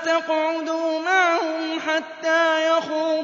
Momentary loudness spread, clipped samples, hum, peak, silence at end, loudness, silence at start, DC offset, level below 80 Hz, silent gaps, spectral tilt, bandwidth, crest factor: 6 LU; under 0.1%; none; -8 dBFS; 0 s; -21 LUFS; 0 s; under 0.1%; -80 dBFS; none; -2 dB/octave; 7.6 kHz; 14 dB